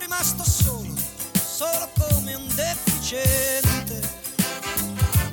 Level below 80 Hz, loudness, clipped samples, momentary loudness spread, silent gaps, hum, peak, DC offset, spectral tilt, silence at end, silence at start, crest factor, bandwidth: -34 dBFS; -22 LUFS; under 0.1%; 7 LU; none; none; -6 dBFS; under 0.1%; -4 dB/octave; 0 s; 0 s; 18 dB; 19 kHz